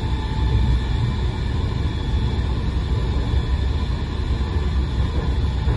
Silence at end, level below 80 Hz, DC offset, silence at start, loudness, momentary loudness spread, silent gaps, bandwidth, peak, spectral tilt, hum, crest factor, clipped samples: 0 s; -22 dBFS; under 0.1%; 0 s; -23 LUFS; 3 LU; none; 11 kHz; -8 dBFS; -7.5 dB/octave; none; 12 dB; under 0.1%